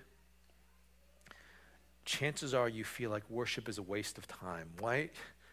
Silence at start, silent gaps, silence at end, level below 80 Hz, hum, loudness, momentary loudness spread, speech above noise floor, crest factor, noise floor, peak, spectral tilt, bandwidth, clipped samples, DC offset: 0 s; none; 0 s; -68 dBFS; none; -39 LUFS; 18 LU; 28 dB; 20 dB; -67 dBFS; -20 dBFS; -4 dB/octave; 16 kHz; under 0.1%; under 0.1%